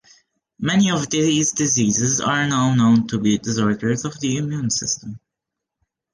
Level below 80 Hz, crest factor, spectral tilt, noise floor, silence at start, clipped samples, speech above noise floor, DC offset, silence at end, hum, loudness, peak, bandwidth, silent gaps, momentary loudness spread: -54 dBFS; 14 dB; -4 dB/octave; -83 dBFS; 0.6 s; under 0.1%; 64 dB; under 0.1%; 0.95 s; none; -19 LUFS; -6 dBFS; 10.5 kHz; none; 7 LU